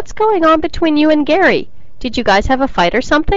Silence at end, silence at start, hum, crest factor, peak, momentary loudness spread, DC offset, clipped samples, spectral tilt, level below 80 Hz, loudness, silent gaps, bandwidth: 0 s; 0 s; none; 10 dB; -4 dBFS; 7 LU; 6%; under 0.1%; -5 dB/octave; -28 dBFS; -13 LUFS; none; 7.8 kHz